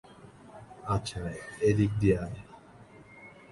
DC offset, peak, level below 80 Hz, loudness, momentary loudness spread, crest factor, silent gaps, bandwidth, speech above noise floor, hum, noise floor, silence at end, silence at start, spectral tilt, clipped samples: under 0.1%; -12 dBFS; -48 dBFS; -30 LUFS; 25 LU; 20 dB; none; 11.5 kHz; 25 dB; none; -53 dBFS; 0.2 s; 0.1 s; -7 dB/octave; under 0.1%